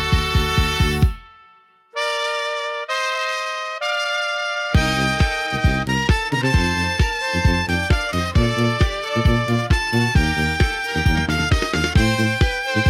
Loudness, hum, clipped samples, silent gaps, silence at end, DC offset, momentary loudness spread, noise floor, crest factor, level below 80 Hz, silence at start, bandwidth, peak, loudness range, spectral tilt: -20 LUFS; none; under 0.1%; none; 0 s; under 0.1%; 5 LU; -53 dBFS; 16 dB; -26 dBFS; 0 s; 16 kHz; -4 dBFS; 4 LU; -5 dB/octave